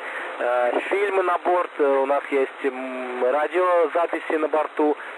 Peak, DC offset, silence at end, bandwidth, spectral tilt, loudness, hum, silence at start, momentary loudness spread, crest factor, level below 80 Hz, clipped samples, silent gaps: -10 dBFS; under 0.1%; 0 s; 11 kHz; -3 dB/octave; -22 LUFS; none; 0 s; 7 LU; 12 dB; -84 dBFS; under 0.1%; none